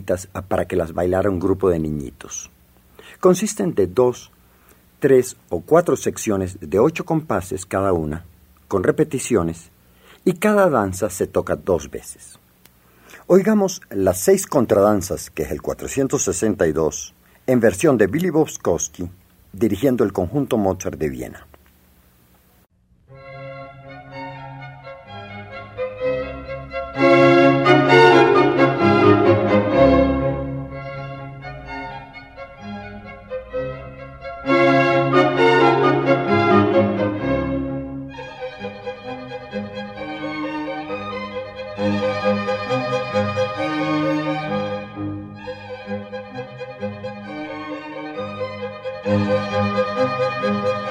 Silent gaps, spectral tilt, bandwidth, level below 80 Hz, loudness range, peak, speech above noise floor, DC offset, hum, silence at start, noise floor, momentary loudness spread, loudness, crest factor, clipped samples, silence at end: none; -5.5 dB/octave; 16 kHz; -44 dBFS; 15 LU; 0 dBFS; 38 dB; under 0.1%; none; 0 s; -57 dBFS; 19 LU; -19 LUFS; 20 dB; under 0.1%; 0 s